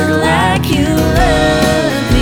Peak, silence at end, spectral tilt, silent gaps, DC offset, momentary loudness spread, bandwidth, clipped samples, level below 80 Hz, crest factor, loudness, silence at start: 0 dBFS; 0 s; -5.5 dB/octave; none; under 0.1%; 2 LU; over 20 kHz; under 0.1%; -22 dBFS; 12 dB; -12 LUFS; 0 s